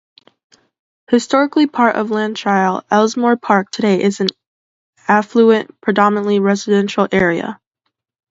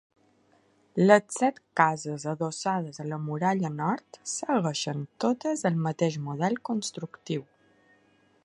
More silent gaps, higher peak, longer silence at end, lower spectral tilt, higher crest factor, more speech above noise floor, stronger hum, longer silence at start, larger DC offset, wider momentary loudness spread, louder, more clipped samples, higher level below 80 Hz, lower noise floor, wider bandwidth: first, 4.47-4.93 s vs none; first, 0 dBFS vs -4 dBFS; second, 0.75 s vs 1 s; about the same, -5.5 dB/octave vs -5.5 dB/octave; second, 16 dB vs 24 dB; first, 59 dB vs 37 dB; neither; first, 1.1 s vs 0.95 s; neither; second, 5 LU vs 12 LU; first, -15 LUFS vs -28 LUFS; neither; first, -56 dBFS vs -74 dBFS; first, -74 dBFS vs -65 dBFS; second, 7.8 kHz vs 11.5 kHz